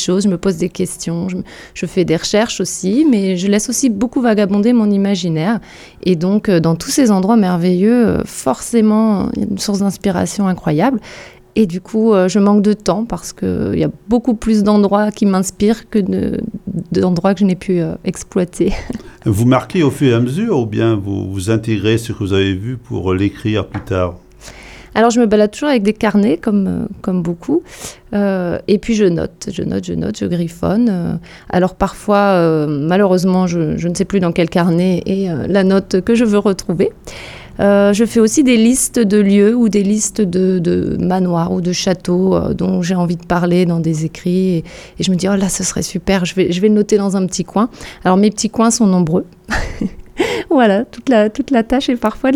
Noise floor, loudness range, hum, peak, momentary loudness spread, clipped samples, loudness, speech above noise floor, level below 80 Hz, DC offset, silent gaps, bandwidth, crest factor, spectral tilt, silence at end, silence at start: -36 dBFS; 4 LU; none; 0 dBFS; 9 LU; under 0.1%; -15 LUFS; 22 dB; -38 dBFS; under 0.1%; none; 15 kHz; 14 dB; -6 dB/octave; 0 s; 0 s